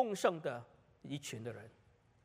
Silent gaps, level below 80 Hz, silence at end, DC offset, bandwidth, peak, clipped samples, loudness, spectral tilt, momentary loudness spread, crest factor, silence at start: none; -78 dBFS; 0.55 s; under 0.1%; 15.5 kHz; -18 dBFS; under 0.1%; -40 LUFS; -4.5 dB/octave; 21 LU; 22 dB; 0 s